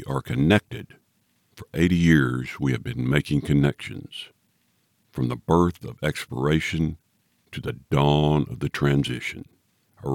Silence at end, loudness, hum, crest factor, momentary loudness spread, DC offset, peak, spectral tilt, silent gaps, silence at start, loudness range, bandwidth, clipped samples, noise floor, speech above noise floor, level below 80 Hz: 0 s; -23 LUFS; none; 20 dB; 18 LU; under 0.1%; -4 dBFS; -7 dB/octave; none; 0 s; 3 LU; 16.5 kHz; under 0.1%; -68 dBFS; 45 dB; -44 dBFS